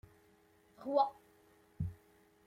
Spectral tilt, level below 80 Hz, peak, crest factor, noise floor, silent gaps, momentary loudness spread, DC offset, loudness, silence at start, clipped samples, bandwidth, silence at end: -8.5 dB/octave; -66 dBFS; -18 dBFS; 22 dB; -68 dBFS; none; 11 LU; under 0.1%; -38 LUFS; 0.8 s; under 0.1%; 15.5 kHz; 0.5 s